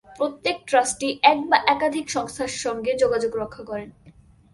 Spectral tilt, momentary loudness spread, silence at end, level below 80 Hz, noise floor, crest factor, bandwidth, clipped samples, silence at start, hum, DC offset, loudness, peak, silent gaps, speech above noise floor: -2.5 dB/octave; 12 LU; 0.45 s; -56 dBFS; -51 dBFS; 20 dB; 11.5 kHz; under 0.1%; 0.1 s; none; under 0.1%; -22 LUFS; -2 dBFS; none; 29 dB